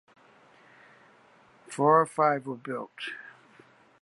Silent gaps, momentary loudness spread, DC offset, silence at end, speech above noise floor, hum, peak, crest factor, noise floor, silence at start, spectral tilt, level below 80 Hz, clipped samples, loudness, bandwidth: none; 20 LU; under 0.1%; 0.75 s; 33 dB; none; -8 dBFS; 22 dB; -59 dBFS; 1.7 s; -5.5 dB/octave; -84 dBFS; under 0.1%; -27 LUFS; 11.5 kHz